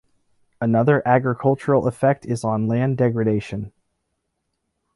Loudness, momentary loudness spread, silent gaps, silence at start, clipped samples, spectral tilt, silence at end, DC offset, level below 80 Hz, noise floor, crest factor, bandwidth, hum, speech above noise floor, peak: -20 LUFS; 9 LU; none; 0.6 s; under 0.1%; -8.5 dB/octave; 1.3 s; under 0.1%; -54 dBFS; -75 dBFS; 18 dB; 11.5 kHz; none; 56 dB; -4 dBFS